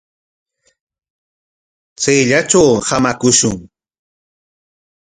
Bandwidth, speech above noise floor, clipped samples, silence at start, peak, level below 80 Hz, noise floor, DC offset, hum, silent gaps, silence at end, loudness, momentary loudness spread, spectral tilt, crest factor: 10.5 kHz; over 77 dB; under 0.1%; 2 s; 0 dBFS; -48 dBFS; under -90 dBFS; under 0.1%; none; none; 1.5 s; -12 LUFS; 8 LU; -3.5 dB/octave; 18 dB